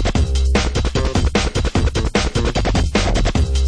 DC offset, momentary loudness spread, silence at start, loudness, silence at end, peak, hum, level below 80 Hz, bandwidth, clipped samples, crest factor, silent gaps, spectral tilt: under 0.1%; 2 LU; 0 s; -18 LUFS; 0 s; -2 dBFS; none; -18 dBFS; 10.5 kHz; under 0.1%; 14 dB; none; -5 dB/octave